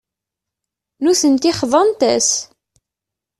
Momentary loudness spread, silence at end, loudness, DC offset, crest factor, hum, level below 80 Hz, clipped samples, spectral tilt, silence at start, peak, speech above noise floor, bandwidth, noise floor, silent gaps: 5 LU; 0.95 s; -15 LUFS; under 0.1%; 18 dB; none; -58 dBFS; under 0.1%; -2.5 dB/octave; 1 s; 0 dBFS; 70 dB; 13 kHz; -84 dBFS; none